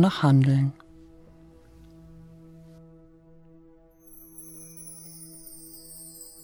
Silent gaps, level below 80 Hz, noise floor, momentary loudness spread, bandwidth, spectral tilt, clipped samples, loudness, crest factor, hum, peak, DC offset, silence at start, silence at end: none; -60 dBFS; -54 dBFS; 30 LU; over 20 kHz; -7 dB/octave; under 0.1%; -22 LUFS; 22 dB; none; -8 dBFS; under 0.1%; 0 s; 0.35 s